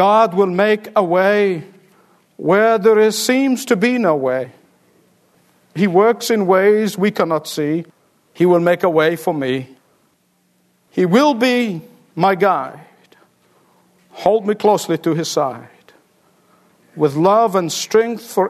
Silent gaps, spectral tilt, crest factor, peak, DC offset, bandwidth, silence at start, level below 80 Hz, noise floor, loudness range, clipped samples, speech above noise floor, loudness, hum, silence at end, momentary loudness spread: none; -5 dB/octave; 16 dB; 0 dBFS; under 0.1%; 13.5 kHz; 0 s; -66 dBFS; -61 dBFS; 4 LU; under 0.1%; 46 dB; -16 LUFS; none; 0 s; 10 LU